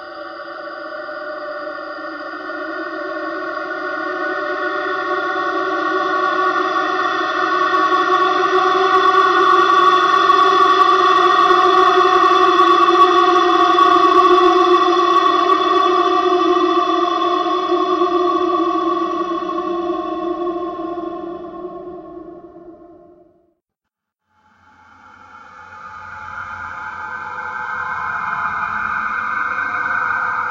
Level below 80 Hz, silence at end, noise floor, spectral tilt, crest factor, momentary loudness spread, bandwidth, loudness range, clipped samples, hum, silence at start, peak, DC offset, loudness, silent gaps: -56 dBFS; 0 s; -81 dBFS; -3.5 dB/octave; 16 dB; 17 LU; 7.8 kHz; 16 LU; under 0.1%; none; 0 s; -2 dBFS; under 0.1%; -15 LUFS; none